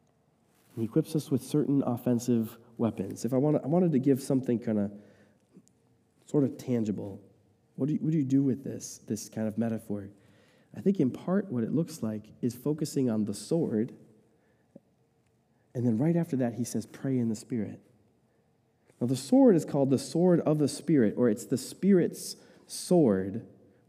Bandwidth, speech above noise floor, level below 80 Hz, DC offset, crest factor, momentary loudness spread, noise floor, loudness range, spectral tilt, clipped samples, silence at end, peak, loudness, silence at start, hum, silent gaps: 15.5 kHz; 41 dB; -74 dBFS; under 0.1%; 18 dB; 13 LU; -69 dBFS; 7 LU; -7 dB/octave; under 0.1%; 0.4 s; -10 dBFS; -29 LUFS; 0.75 s; none; none